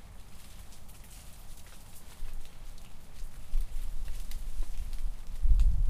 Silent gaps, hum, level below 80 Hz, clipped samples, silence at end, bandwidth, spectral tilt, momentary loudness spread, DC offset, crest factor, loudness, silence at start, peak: none; none; -32 dBFS; under 0.1%; 0 s; 14.5 kHz; -5 dB/octave; 15 LU; under 0.1%; 18 dB; -40 LUFS; 0 s; -10 dBFS